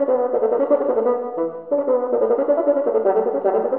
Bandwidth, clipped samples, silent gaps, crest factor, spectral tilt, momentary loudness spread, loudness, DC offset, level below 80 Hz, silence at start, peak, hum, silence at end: 3.1 kHz; under 0.1%; none; 14 dB; -7 dB/octave; 5 LU; -19 LUFS; 0.2%; -72 dBFS; 0 s; -6 dBFS; none; 0 s